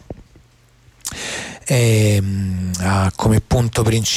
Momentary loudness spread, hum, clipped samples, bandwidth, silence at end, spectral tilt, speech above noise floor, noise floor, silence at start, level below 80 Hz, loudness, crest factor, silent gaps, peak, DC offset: 14 LU; none; under 0.1%; 15.5 kHz; 0 s; -5 dB/octave; 36 dB; -51 dBFS; 0.1 s; -36 dBFS; -18 LUFS; 12 dB; none; -6 dBFS; under 0.1%